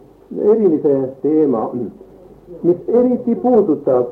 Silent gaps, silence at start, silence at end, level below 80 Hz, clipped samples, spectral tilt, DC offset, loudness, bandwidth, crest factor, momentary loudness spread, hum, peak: none; 0.3 s; 0 s; -54 dBFS; under 0.1%; -11.5 dB/octave; under 0.1%; -16 LUFS; 2.8 kHz; 14 dB; 9 LU; none; -2 dBFS